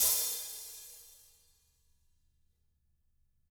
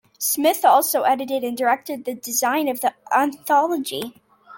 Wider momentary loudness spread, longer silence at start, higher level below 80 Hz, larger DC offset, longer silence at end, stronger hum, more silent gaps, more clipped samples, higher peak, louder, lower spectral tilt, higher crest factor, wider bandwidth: first, 24 LU vs 12 LU; second, 0 s vs 0.2 s; about the same, -68 dBFS vs -72 dBFS; neither; first, 2.4 s vs 0 s; neither; neither; neither; second, -14 dBFS vs -4 dBFS; second, -33 LUFS vs -20 LUFS; second, 2.5 dB/octave vs -1.5 dB/octave; first, 26 dB vs 18 dB; first, over 20 kHz vs 17 kHz